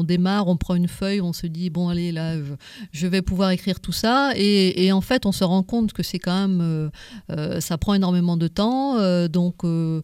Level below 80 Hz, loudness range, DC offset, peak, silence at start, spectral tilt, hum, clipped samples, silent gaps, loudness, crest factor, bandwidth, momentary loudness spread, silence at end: -42 dBFS; 4 LU; under 0.1%; -6 dBFS; 0 s; -6 dB/octave; none; under 0.1%; none; -22 LUFS; 16 dB; 15.5 kHz; 9 LU; 0 s